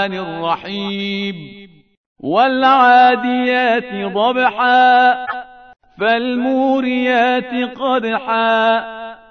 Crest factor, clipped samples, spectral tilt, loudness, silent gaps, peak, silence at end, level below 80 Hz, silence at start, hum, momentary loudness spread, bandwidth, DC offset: 14 dB; under 0.1%; -6 dB/octave; -15 LUFS; 1.97-2.16 s; 0 dBFS; 0.15 s; -60 dBFS; 0 s; none; 12 LU; 6.4 kHz; 0.1%